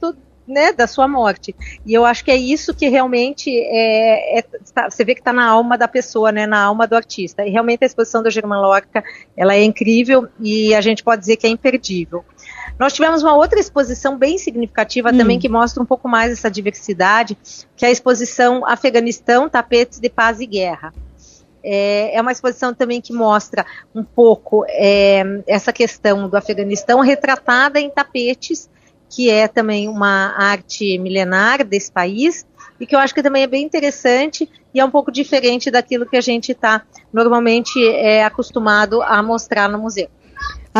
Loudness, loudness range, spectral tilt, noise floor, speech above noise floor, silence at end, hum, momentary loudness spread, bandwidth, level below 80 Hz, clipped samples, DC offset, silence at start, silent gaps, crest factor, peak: -15 LUFS; 2 LU; -4 dB/octave; -47 dBFS; 32 dB; 0 s; none; 10 LU; 7.6 kHz; -44 dBFS; under 0.1%; under 0.1%; 0 s; none; 14 dB; 0 dBFS